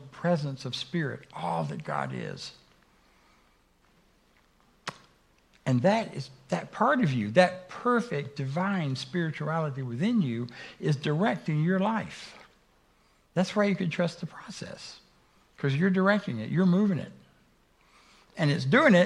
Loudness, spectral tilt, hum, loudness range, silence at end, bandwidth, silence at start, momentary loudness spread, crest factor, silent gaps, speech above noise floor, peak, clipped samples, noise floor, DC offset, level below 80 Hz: -28 LUFS; -6.5 dB/octave; none; 10 LU; 0 s; 11 kHz; 0 s; 17 LU; 24 dB; none; 37 dB; -4 dBFS; under 0.1%; -65 dBFS; under 0.1%; -68 dBFS